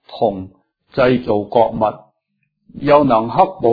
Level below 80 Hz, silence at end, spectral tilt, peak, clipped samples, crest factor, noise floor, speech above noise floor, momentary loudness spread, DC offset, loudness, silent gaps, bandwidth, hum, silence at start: -46 dBFS; 0 s; -9.5 dB/octave; 0 dBFS; under 0.1%; 16 dB; -70 dBFS; 55 dB; 12 LU; under 0.1%; -16 LUFS; none; 5 kHz; none; 0.1 s